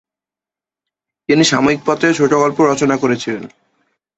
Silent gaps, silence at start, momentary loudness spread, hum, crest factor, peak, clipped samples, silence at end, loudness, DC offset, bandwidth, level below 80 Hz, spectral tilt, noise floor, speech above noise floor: none; 1.3 s; 10 LU; none; 16 dB; -2 dBFS; under 0.1%; 0.7 s; -14 LUFS; under 0.1%; 8.2 kHz; -54 dBFS; -4.5 dB/octave; -89 dBFS; 75 dB